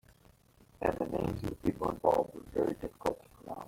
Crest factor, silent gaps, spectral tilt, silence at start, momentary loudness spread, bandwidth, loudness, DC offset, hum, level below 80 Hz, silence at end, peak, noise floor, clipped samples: 22 dB; none; -7.5 dB/octave; 0.8 s; 8 LU; 16.5 kHz; -34 LUFS; under 0.1%; none; -54 dBFS; 0 s; -12 dBFS; -63 dBFS; under 0.1%